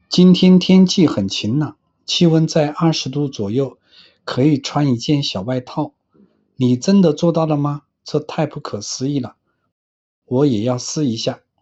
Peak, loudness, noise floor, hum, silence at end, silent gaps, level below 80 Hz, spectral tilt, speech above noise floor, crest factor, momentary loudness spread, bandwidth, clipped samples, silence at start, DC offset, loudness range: -2 dBFS; -17 LUFS; -55 dBFS; none; 0.25 s; 9.72-10.22 s; -56 dBFS; -6 dB/octave; 39 dB; 16 dB; 14 LU; 8 kHz; under 0.1%; 0.1 s; under 0.1%; 6 LU